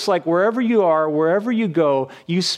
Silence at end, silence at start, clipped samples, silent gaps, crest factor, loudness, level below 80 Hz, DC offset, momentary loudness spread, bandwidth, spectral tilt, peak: 0 s; 0 s; under 0.1%; none; 12 dB; -18 LUFS; -74 dBFS; under 0.1%; 5 LU; 13.5 kHz; -5.5 dB/octave; -6 dBFS